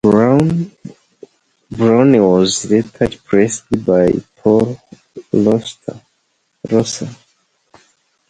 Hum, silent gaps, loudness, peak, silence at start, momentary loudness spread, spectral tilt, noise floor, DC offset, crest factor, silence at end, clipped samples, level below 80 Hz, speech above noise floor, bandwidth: none; none; -14 LUFS; 0 dBFS; 0.05 s; 18 LU; -6 dB/octave; -64 dBFS; under 0.1%; 16 dB; 1.15 s; under 0.1%; -46 dBFS; 51 dB; 10.5 kHz